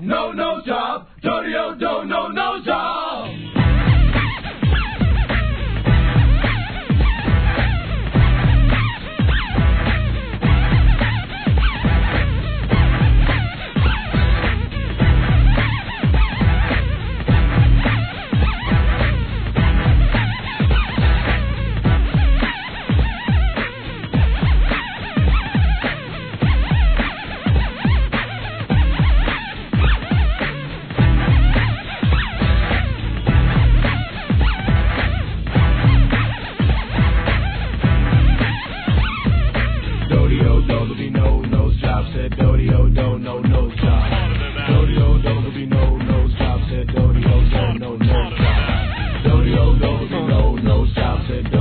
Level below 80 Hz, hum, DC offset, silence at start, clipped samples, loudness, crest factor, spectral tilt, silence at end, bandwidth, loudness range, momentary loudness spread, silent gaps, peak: -18 dBFS; none; 0.2%; 0 s; under 0.1%; -18 LUFS; 14 dB; -10.5 dB/octave; 0 s; 4.5 kHz; 2 LU; 7 LU; none; -2 dBFS